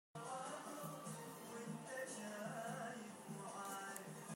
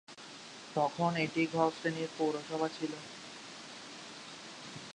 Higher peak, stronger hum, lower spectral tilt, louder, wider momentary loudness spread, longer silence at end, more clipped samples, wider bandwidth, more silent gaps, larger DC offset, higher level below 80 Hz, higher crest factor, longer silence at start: second, -26 dBFS vs -16 dBFS; neither; about the same, -4 dB/octave vs -5 dB/octave; second, -50 LUFS vs -35 LUFS; second, 4 LU vs 15 LU; about the same, 0 s vs 0 s; neither; first, 16 kHz vs 11 kHz; neither; neither; second, under -90 dBFS vs -78 dBFS; about the same, 24 dB vs 22 dB; about the same, 0.15 s vs 0.1 s